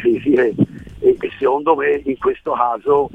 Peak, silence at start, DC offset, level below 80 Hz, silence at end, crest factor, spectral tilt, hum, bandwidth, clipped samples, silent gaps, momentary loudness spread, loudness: -2 dBFS; 0 s; 0.1%; -48 dBFS; 0.05 s; 16 dB; -8.5 dB/octave; none; 3.8 kHz; under 0.1%; none; 5 LU; -17 LUFS